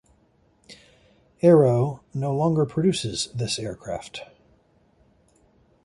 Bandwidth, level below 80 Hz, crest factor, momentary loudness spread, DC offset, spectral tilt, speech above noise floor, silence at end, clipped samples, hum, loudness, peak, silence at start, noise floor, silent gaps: 11.5 kHz; -56 dBFS; 20 dB; 17 LU; under 0.1%; -6 dB/octave; 40 dB; 1.6 s; under 0.1%; none; -23 LUFS; -4 dBFS; 0.7 s; -62 dBFS; none